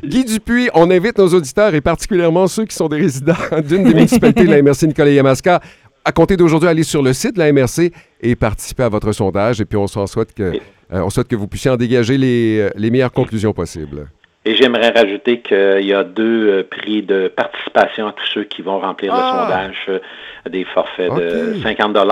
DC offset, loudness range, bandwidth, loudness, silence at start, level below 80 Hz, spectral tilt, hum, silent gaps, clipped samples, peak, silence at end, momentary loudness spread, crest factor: under 0.1%; 6 LU; 16.5 kHz; -14 LUFS; 0.05 s; -38 dBFS; -6 dB/octave; none; none; under 0.1%; 0 dBFS; 0 s; 10 LU; 14 dB